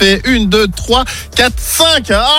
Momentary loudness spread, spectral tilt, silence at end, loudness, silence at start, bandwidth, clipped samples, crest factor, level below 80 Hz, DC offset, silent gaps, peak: 4 LU; -3 dB/octave; 0 s; -11 LUFS; 0 s; 17 kHz; under 0.1%; 12 dB; -24 dBFS; under 0.1%; none; 0 dBFS